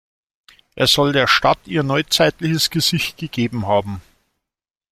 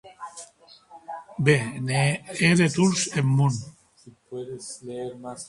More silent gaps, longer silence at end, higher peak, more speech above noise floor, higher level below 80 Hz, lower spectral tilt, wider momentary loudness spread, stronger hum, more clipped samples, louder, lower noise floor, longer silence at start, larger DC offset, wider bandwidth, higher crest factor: neither; first, 0.9 s vs 0 s; first, 0 dBFS vs -4 dBFS; first, 69 dB vs 30 dB; first, -48 dBFS vs -60 dBFS; about the same, -4 dB/octave vs -5 dB/octave; second, 9 LU vs 20 LU; neither; neither; first, -17 LUFS vs -23 LUFS; first, -86 dBFS vs -53 dBFS; first, 0.75 s vs 0.05 s; neither; first, 16.5 kHz vs 11.5 kHz; about the same, 20 dB vs 22 dB